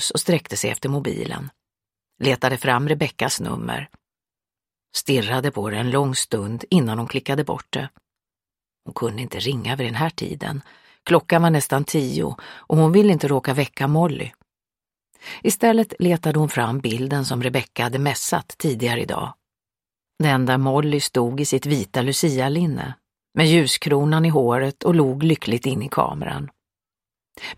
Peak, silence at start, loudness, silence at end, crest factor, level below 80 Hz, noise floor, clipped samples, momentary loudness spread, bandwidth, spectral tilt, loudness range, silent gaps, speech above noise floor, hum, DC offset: 0 dBFS; 0 s; -21 LUFS; 0.05 s; 20 dB; -56 dBFS; under -90 dBFS; under 0.1%; 12 LU; 16.5 kHz; -5 dB/octave; 5 LU; none; over 70 dB; none; under 0.1%